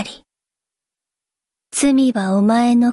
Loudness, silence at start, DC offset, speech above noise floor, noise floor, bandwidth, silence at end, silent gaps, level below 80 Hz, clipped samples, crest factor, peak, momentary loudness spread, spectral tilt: -16 LUFS; 0 s; under 0.1%; 73 dB; -87 dBFS; 11.5 kHz; 0 s; none; -58 dBFS; under 0.1%; 12 dB; -6 dBFS; 10 LU; -5 dB/octave